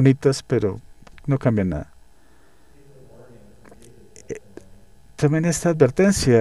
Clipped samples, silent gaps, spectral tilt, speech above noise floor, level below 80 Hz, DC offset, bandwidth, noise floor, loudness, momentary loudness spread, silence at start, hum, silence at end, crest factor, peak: under 0.1%; none; -6 dB/octave; 37 dB; -44 dBFS; 0.4%; 13 kHz; -55 dBFS; -20 LUFS; 20 LU; 0 s; none; 0 s; 18 dB; -4 dBFS